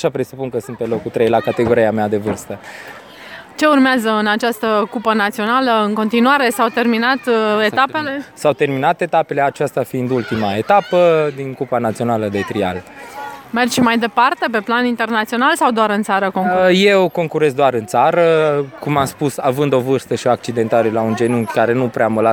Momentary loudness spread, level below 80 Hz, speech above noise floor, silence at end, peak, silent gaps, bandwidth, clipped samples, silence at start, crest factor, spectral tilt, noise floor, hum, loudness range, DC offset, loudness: 10 LU; -56 dBFS; 20 dB; 0 s; 0 dBFS; none; over 20 kHz; under 0.1%; 0 s; 16 dB; -5.5 dB/octave; -36 dBFS; none; 3 LU; under 0.1%; -16 LUFS